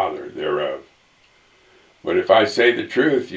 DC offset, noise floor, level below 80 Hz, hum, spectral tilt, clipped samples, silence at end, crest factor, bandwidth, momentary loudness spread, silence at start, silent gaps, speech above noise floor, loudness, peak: under 0.1%; -56 dBFS; -60 dBFS; none; -5 dB/octave; under 0.1%; 0 s; 20 dB; 8 kHz; 12 LU; 0 s; none; 39 dB; -19 LUFS; 0 dBFS